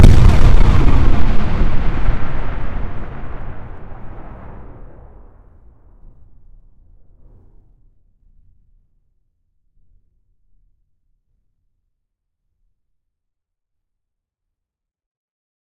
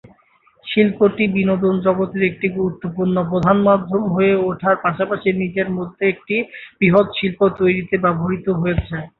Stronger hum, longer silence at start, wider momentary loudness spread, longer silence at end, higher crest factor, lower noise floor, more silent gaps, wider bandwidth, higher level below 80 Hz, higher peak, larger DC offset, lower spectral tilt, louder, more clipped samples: neither; second, 0 s vs 0.65 s; first, 24 LU vs 7 LU; first, 9.4 s vs 0.1 s; about the same, 14 dB vs 16 dB; first, -83 dBFS vs -56 dBFS; neither; first, 6.4 kHz vs 4.2 kHz; first, -20 dBFS vs -42 dBFS; about the same, 0 dBFS vs -2 dBFS; neither; second, -7.5 dB/octave vs -9.5 dB/octave; about the same, -18 LUFS vs -18 LUFS; first, 0.3% vs under 0.1%